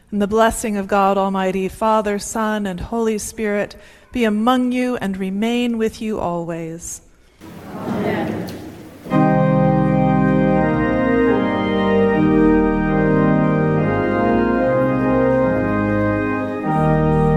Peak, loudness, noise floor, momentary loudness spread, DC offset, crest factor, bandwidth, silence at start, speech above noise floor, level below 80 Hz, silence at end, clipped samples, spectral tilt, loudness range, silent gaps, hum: -2 dBFS; -18 LUFS; -42 dBFS; 10 LU; under 0.1%; 16 dB; 14.5 kHz; 0.1 s; 22 dB; -36 dBFS; 0 s; under 0.1%; -6.5 dB/octave; 7 LU; none; none